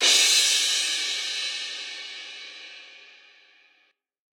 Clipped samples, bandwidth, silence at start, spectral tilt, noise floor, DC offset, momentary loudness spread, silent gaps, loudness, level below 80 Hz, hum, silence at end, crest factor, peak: under 0.1%; over 20 kHz; 0 s; 4.5 dB/octave; -67 dBFS; under 0.1%; 23 LU; none; -21 LUFS; under -90 dBFS; none; 1.3 s; 20 dB; -6 dBFS